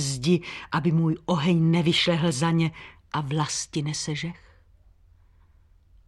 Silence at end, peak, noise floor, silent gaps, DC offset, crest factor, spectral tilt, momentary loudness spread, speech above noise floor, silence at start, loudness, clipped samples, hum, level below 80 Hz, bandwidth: 1.7 s; -10 dBFS; -57 dBFS; none; under 0.1%; 16 dB; -5 dB/octave; 10 LU; 33 dB; 0 s; -25 LUFS; under 0.1%; none; -56 dBFS; 12 kHz